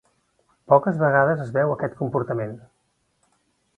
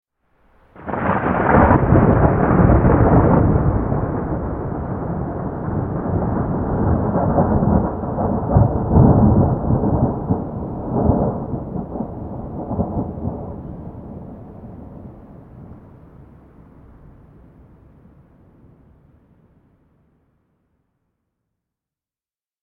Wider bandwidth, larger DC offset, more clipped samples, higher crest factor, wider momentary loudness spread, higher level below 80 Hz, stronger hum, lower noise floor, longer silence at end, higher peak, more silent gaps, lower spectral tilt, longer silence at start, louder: first, 4.4 kHz vs 3.3 kHz; neither; neither; about the same, 22 dB vs 18 dB; second, 11 LU vs 20 LU; second, -62 dBFS vs -30 dBFS; neither; second, -70 dBFS vs under -90 dBFS; second, 1.2 s vs 6.85 s; about the same, -2 dBFS vs 0 dBFS; neither; second, -10 dB/octave vs -13.5 dB/octave; about the same, 0.7 s vs 0.75 s; second, -21 LUFS vs -18 LUFS